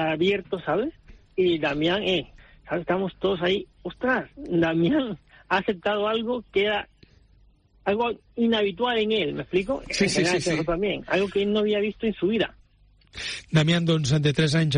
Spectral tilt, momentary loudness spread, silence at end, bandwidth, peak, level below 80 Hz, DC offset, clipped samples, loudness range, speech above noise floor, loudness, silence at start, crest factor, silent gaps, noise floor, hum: -5.5 dB/octave; 9 LU; 0 s; 10 kHz; -8 dBFS; -50 dBFS; under 0.1%; under 0.1%; 2 LU; 34 dB; -25 LUFS; 0 s; 16 dB; none; -58 dBFS; none